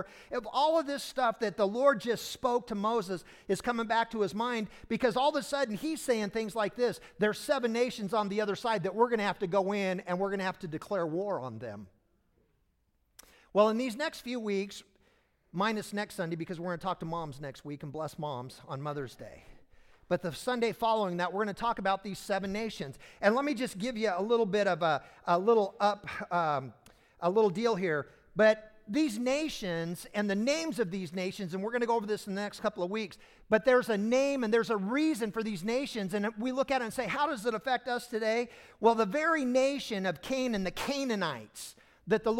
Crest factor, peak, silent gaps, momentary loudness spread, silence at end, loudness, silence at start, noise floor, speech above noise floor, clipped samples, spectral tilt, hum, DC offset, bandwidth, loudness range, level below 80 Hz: 20 dB; -12 dBFS; none; 11 LU; 0 s; -31 LUFS; 0 s; -74 dBFS; 43 dB; under 0.1%; -5 dB/octave; none; under 0.1%; 16.5 kHz; 6 LU; -64 dBFS